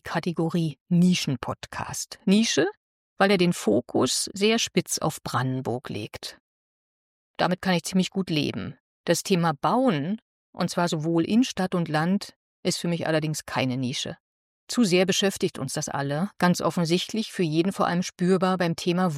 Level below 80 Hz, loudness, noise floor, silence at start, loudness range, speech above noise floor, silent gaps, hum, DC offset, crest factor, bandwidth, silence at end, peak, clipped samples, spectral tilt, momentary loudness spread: -62 dBFS; -25 LUFS; under -90 dBFS; 0.05 s; 4 LU; over 66 dB; 0.80-0.86 s, 2.77-3.16 s, 6.40-7.34 s, 8.80-9.04 s, 10.22-10.53 s, 12.36-12.63 s, 14.20-14.67 s; none; under 0.1%; 18 dB; 15 kHz; 0 s; -8 dBFS; under 0.1%; -5 dB/octave; 10 LU